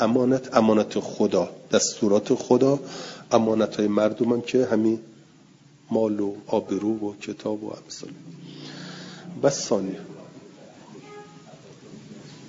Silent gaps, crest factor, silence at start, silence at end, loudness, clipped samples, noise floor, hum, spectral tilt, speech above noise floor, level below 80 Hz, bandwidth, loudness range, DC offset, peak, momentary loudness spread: none; 22 dB; 0 s; 0 s; -23 LUFS; under 0.1%; -53 dBFS; none; -5 dB/octave; 30 dB; -68 dBFS; 7.8 kHz; 8 LU; under 0.1%; -4 dBFS; 22 LU